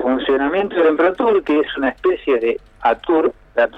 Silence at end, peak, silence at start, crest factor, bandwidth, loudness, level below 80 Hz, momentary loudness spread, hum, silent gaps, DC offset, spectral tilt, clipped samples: 0 s; -4 dBFS; 0 s; 12 dB; 5.2 kHz; -17 LUFS; -48 dBFS; 5 LU; none; none; under 0.1%; -6.5 dB/octave; under 0.1%